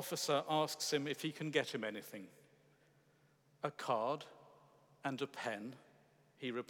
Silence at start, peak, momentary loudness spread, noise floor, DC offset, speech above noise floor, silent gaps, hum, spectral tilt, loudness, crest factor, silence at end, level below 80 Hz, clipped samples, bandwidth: 0 s; -20 dBFS; 16 LU; -72 dBFS; under 0.1%; 32 dB; none; none; -3.5 dB/octave; -40 LUFS; 22 dB; 0.05 s; under -90 dBFS; under 0.1%; 19.5 kHz